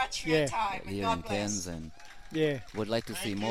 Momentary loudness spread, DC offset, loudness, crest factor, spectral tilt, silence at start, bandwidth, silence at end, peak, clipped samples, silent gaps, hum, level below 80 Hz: 11 LU; 0.4%; -32 LUFS; 20 dB; -4 dB/octave; 0 s; 16 kHz; 0 s; -14 dBFS; under 0.1%; none; none; -52 dBFS